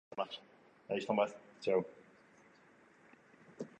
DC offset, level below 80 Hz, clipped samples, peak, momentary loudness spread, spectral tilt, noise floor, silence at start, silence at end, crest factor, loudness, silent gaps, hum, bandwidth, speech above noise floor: under 0.1%; -84 dBFS; under 0.1%; -20 dBFS; 16 LU; -5.5 dB/octave; -65 dBFS; 0.1 s; 0.1 s; 22 dB; -38 LUFS; none; none; 9.2 kHz; 29 dB